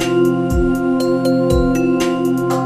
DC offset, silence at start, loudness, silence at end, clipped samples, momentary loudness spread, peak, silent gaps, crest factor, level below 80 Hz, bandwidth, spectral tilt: under 0.1%; 0 s; -16 LUFS; 0 s; under 0.1%; 2 LU; -2 dBFS; none; 12 dB; -28 dBFS; 14.5 kHz; -6.5 dB/octave